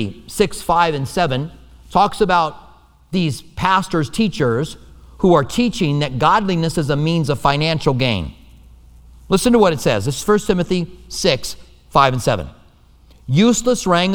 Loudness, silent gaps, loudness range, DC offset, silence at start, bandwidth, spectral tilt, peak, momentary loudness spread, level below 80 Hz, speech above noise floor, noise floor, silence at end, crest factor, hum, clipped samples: -17 LUFS; none; 2 LU; under 0.1%; 0 s; 19.5 kHz; -5.5 dB/octave; 0 dBFS; 9 LU; -38 dBFS; 32 dB; -48 dBFS; 0 s; 18 dB; none; under 0.1%